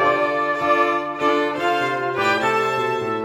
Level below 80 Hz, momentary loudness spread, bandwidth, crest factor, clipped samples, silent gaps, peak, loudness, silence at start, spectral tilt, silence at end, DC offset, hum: -60 dBFS; 3 LU; 16 kHz; 14 dB; under 0.1%; none; -6 dBFS; -20 LUFS; 0 s; -4.5 dB/octave; 0 s; under 0.1%; none